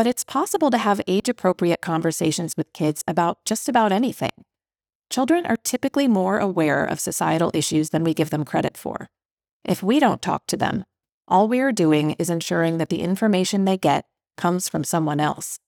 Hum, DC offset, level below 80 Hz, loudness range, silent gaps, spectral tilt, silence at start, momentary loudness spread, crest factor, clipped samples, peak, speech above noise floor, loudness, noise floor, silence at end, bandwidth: none; under 0.1%; -64 dBFS; 2 LU; 4.95-5.00 s, 9.32-9.37 s, 9.51-9.60 s, 11.14-11.21 s; -5 dB/octave; 0 s; 6 LU; 18 dB; under 0.1%; -4 dBFS; over 69 dB; -22 LUFS; under -90 dBFS; 0.1 s; over 20 kHz